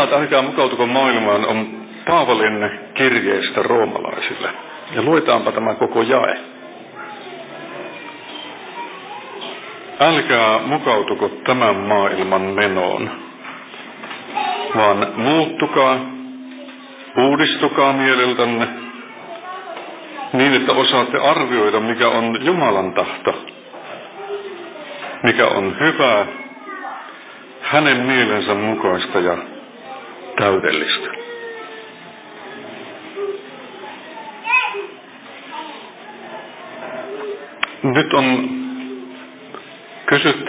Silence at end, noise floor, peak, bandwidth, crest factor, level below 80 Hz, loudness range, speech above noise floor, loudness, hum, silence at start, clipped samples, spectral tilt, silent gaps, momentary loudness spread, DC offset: 0 s; -38 dBFS; 0 dBFS; 4 kHz; 18 dB; -60 dBFS; 8 LU; 22 dB; -17 LUFS; none; 0 s; under 0.1%; -8.5 dB/octave; none; 20 LU; under 0.1%